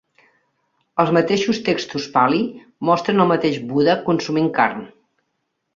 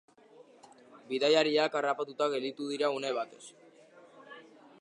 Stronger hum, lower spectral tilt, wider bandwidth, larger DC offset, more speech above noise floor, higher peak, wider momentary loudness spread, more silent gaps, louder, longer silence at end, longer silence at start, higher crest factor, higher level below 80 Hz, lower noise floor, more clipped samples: neither; first, -6 dB/octave vs -3.5 dB/octave; second, 7.6 kHz vs 11 kHz; neither; first, 55 dB vs 27 dB; first, -2 dBFS vs -10 dBFS; second, 6 LU vs 25 LU; neither; first, -19 LUFS vs -31 LUFS; first, 0.9 s vs 0.4 s; first, 0.95 s vs 0.4 s; about the same, 18 dB vs 22 dB; first, -60 dBFS vs -90 dBFS; first, -74 dBFS vs -58 dBFS; neither